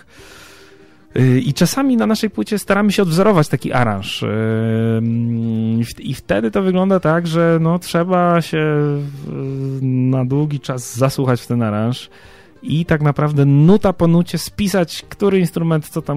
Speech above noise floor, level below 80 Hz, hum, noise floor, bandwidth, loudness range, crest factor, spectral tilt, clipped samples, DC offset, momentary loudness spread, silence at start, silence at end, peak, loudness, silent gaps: 30 dB; -44 dBFS; none; -46 dBFS; 16 kHz; 3 LU; 14 dB; -6.5 dB/octave; under 0.1%; under 0.1%; 9 LU; 0.2 s; 0 s; -2 dBFS; -16 LUFS; none